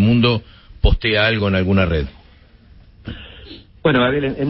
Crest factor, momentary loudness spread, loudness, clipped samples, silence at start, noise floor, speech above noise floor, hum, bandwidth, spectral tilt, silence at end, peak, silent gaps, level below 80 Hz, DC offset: 16 dB; 20 LU; -17 LUFS; under 0.1%; 0 s; -47 dBFS; 31 dB; none; 5.8 kHz; -11 dB/octave; 0 s; -2 dBFS; none; -28 dBFS; under 0.1%